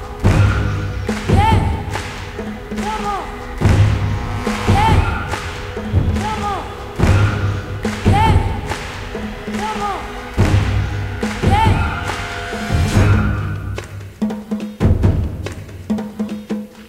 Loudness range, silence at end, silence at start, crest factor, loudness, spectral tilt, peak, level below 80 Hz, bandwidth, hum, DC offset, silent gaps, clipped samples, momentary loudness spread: 2 LU; 0 s; 0 s; 16 dB; -18 LUFS; -6.5 dB/octave; 0 dBFS; -24 dBFS; 13.5 kHz; none; under 0.1%; none; under 0.1%; 12 LU